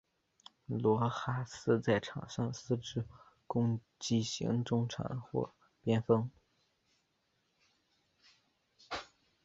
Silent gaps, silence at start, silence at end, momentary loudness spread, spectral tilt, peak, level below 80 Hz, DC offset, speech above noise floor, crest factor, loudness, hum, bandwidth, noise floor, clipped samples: none; 0.7 s; 0.4 s; 13 LU; -6 dB/octave; -14 dBFS; -66 dBFS; under 0.1%; 45 dB; 22 dB; -36 LUFS; none; 7.8 kHz; -79 dBFS; under 0.1%